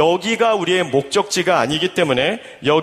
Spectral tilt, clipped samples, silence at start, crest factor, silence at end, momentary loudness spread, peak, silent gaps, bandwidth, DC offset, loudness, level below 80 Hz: -4 dB/octave; under 0.1%; 0 s; 16 dB; 0 s; 2 LU; 0 dBFS; none; 15 kHz; under 0.1%; -17 LUFS; -54 dBFS